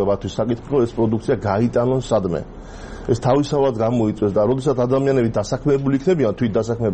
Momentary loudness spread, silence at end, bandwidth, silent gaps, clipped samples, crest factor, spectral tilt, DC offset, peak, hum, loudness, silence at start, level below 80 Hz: 6 LU; 0 s; 8.8 kHz; none; under 0.1%; 14 dB; -7.5 dB/octave; 0.2%; -4 dBFS; none; -19 LUFS; 0 s; -40 dBFS